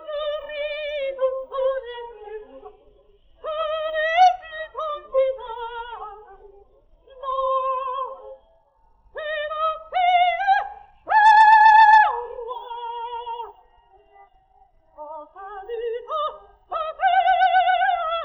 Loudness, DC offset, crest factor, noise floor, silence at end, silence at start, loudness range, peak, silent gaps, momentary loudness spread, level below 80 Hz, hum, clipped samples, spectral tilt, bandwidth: -20 LUFS; under 0.1%; 18 dB; -59 dBFS; 0 s; 0 s; 17 LU; -4 dBFS; none; 24 LU; -56 dBFS; none; under 0.1%; -1 dB/octave; 8.2 kHz